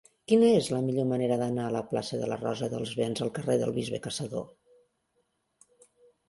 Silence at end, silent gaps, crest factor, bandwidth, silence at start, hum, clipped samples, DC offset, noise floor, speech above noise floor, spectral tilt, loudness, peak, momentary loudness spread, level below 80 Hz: 1.85 s; none; 18 dB; 12 kHz; 0.3 s; none; under 0.1%; under 0.1%; -75 dBFS; 47 dB; -6 dB/octave; -29 LUFS; -10 dBFS; 11 LU; -66 dBFS